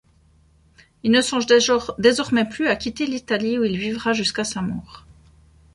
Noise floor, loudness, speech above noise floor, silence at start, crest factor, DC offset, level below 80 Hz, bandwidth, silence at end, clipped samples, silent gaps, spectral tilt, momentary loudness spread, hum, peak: -56 dBFS; -20 LUFS; 36 dB; 1.05 s; 20 dB; under 0.1%; -52 dBFS; 11.5 kHz; 0.75 s; under 0.1%; none; -3.5 dB/octave; 10 LU; none; -2 dBFS